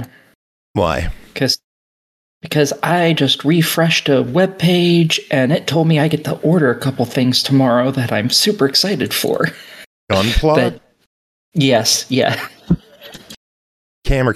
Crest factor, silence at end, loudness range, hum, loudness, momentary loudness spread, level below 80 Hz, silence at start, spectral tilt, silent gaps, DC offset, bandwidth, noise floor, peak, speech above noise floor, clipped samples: 16 dB; 0 s; 4 LU; none; -15 LUFS; 8 LU; -32 dBFS; 0 s; -4.5 dB/octave; 0.35-0.74 s, 1.64-2.41 s, 9.86-10.07 s, 11.06-11.52 s, 13.37-14.02 s; under 0.1%; 15 kHz; -39 dBFS; 0 dBFS; 24 dB; under 0.1%